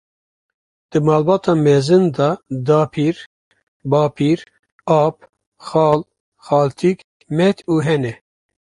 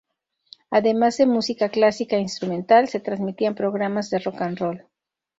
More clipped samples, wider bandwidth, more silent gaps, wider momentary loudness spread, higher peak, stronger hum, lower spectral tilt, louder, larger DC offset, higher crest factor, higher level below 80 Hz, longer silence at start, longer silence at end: neither; first, 11 kHz vs 8 kHz; first, 3.26-3.51 s, 3.63-3.80 s, 4.59-4.63 s, 4.72-4.79 s, 5.47-5.52 s, 6.20-6.32 s, 7.04-7.20 s vs none; about the same, 9 LU vs 10 LU; about the same, -2 dBFS vs -4 dBFS; neither; first, -7.5 dB/octave vs -5.5 dB/octave; first, -17 LUFS vs -22 LUFS; neither; about the same, 16 dB vs 18 dB; first, -56 dBFS vs -66 dBFS; first, 0.95 s vs 0.7 s; about the same, 0.6 s vs 0.6 s